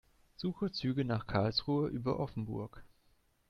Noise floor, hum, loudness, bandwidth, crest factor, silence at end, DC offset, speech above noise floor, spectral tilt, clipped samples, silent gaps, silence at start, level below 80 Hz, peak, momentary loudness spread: -71 dBFS; none; -36 LUFS; 9.6 kHz; 20 dB; 0.65 s; under 0.1%; 36 dB; -7.5 dB/octave; under 0.1%; none; 0.4 s; -58 dBFS; -16 dBFS; 9 LU